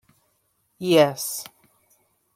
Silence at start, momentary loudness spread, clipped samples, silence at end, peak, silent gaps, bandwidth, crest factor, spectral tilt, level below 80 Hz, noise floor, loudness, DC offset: 0.8 s; 16 LU; under 0.1%; 0.9 s; -4 dBFS; none; 16.5 kHz; 22 dB; -4 dB/octave; -72 dBFS; -69 dBFS; -22 LUFS; under 0.1%